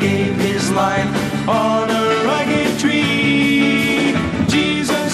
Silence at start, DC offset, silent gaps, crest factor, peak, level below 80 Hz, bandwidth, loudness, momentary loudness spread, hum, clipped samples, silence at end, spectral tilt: 0 s; under 0.1%; none; 12 dB; -4 dBFS; -42 dBFS; 15 kHz; -16 LUFS; 4 LU; none; under 0.1%; 0 s; -5 dB/octave